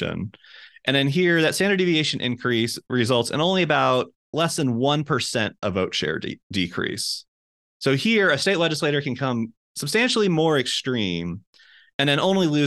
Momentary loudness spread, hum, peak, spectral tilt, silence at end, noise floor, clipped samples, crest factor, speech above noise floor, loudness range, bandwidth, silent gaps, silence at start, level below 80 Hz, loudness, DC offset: 10 LU; none; -4 dBFS; -4.5 dB/octave; 0 s; under -90 dBFS; under 0.1%; 18 dB; over 68 dB; 3 LU; 12.5 kHz; 4.16-4.33 s, 6.43-6.50 s, 7.28-7.80 s, 9.57-9.75 s, 11.47-11.53 s, 11.94-11.99 s; 0 s; -60 dBFS; -22 LUFS; under 0.1%